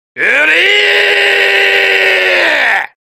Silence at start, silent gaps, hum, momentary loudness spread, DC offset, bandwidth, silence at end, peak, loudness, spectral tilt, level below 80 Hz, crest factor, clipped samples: 0.15 s; none; none; 3 LU; under 0.1%; 16 kHz; 0.15 s; 0 dBFS; -7 LUFS; -0.5 dB/octave; -58 dBFS; 10 dB; under 0.1%